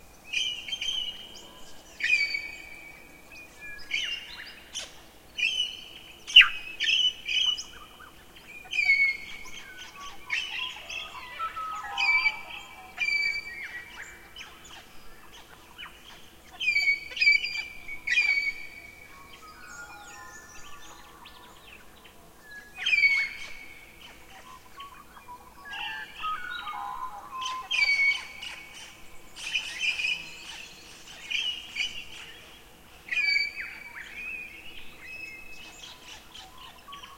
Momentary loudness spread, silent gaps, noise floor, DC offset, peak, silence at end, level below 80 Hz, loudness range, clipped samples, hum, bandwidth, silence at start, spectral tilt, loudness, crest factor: 25 LU; none; -52 dBFS; 0.1%; -2 dBFS; 0 s; -58 dBFS; 15 LU; under 0.1%; none; 16.5 kHz; 0 s; 1 dB/octave; -26 LUFS; 30 dB